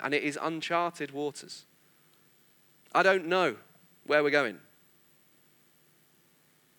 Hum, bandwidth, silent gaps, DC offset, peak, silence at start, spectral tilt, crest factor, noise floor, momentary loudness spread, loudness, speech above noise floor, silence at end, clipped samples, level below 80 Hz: none; over 20 kHz; none; under 0.1%; -8 dBFS; 0 s; -4 dB/octave; 24 dB; -65 dBFS; 22 LU; -29 LUFS; 37 dB; 2.2 s; under 0.1%; under -90 dBFS